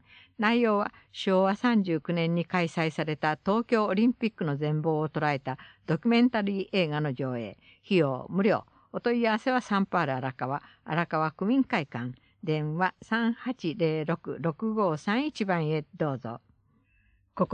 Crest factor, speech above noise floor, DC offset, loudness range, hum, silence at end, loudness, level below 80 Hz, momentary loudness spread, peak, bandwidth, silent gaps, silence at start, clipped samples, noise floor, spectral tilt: 20 dB; 39 dB; under 0.1%; 3 LU; none; 0 s; -28 LUFS; -68 dBFS; 9 LU; -8 dBFS; 9 kHz; none; 0.4 s; under 0.1%; -67 dBFS; -7.5 dB/octave